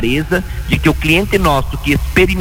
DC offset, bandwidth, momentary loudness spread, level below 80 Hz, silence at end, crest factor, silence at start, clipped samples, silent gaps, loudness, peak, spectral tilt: under 0.1%; 17 kHz; 6 LU; -22 dBFS; 0 s; 14 dB; 0 s; under 0.1%; none; -14 LUFS; 0 dBFS; -5.5 dB/octave